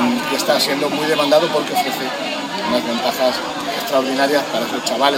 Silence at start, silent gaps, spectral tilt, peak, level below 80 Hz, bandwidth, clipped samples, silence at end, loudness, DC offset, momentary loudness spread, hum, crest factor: 0 s; none; -3 dB/octave; -2 dBFS; -60 dBFS; 17 kHz; under 0.1%; 0 s; -18 LUFS; under 0.1%; 7 LU; none; 16 dB